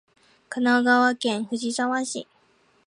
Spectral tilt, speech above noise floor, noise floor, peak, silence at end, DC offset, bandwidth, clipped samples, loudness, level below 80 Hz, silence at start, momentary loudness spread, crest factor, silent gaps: -3 dB/octave; 39 dB; -62 dBFS; -6 dBFS; 0.65 s; under 0.1%; 11 kHz; under 0.1%; -23 LUFS; -78 dBFS; 0.5 s; 13 LU; 18 dB; none